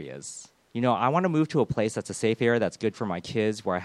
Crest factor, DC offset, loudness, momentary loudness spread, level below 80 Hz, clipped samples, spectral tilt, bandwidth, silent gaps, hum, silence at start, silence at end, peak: 18 dB; under 0.1%; -26 LUFS; 14 LU; -60 dBFS; under 0.1%; -6 dB/octave; 12.5 kHz; none; none; 0 s; 0 s; -8 dBFS